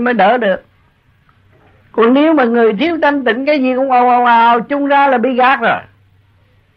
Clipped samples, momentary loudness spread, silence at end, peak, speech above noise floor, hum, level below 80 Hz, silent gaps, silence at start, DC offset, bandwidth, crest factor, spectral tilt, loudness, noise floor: under 0.1%; 6 LU; 0.95 s; -2 dBFS; 41 dB; none; -56 dBFS; none; 0 s; under 0.1%; 6 kHz; 10 dB; -7.5 dB/octave; -12 LUFS; -52 dBFS